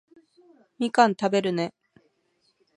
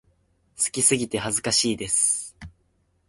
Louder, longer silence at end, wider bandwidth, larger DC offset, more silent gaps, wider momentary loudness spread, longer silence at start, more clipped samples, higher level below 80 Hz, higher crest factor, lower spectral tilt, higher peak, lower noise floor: about the same, -24 LUFS vs -22 LUFS; first, 1.05 s vs 0.6 s; about the same, 11.5 kHz vs 12 kHz; neither; neither; first, 10 LU vs 7 LU; first, 0.8 s vs 0.6 s; neither; second, -76 dBFS vs -54 dBFS; about the same, 24 dB vs 20 dB; first, -5.5 dB/octave vs -2 dB/octave; about the same, -4 dBFS vs -6 dBFS; about the same, -70 dBFS vs -67 dBFS